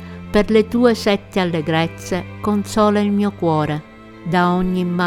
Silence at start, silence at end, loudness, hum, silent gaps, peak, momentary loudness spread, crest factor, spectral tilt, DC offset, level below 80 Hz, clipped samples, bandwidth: 0 s; 0 s; -18 LUFS; none; none; 0 dBFS; 8 LU; 18 dB; -6.5 dB/octave; under 0.1%; -40 dBFS; under 0.1%; 15.5 kHz